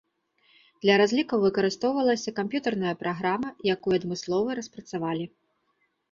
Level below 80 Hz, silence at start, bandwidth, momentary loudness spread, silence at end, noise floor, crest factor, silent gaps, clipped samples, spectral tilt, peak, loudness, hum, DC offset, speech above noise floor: -66 dBFS; 0.85 s; 7.6 kHz; 10 LU; 0.85 s; -73 dBFS; 20 dB; none; under 0.1%; -5 dB/octave; -6 dBFS; -26 LUFS; none; under 0.1%; 47 dB